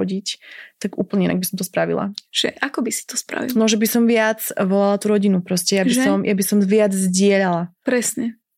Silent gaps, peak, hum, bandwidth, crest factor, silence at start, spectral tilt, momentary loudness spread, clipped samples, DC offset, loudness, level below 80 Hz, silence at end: none; -4 dBFS; none; 16.5 kHz; 16 dB; 0 s; -4.5 dB/octave; 9 LU; under 0.1%; under 0.1%; -19 LUFS; -64 dBFS; 0.25 s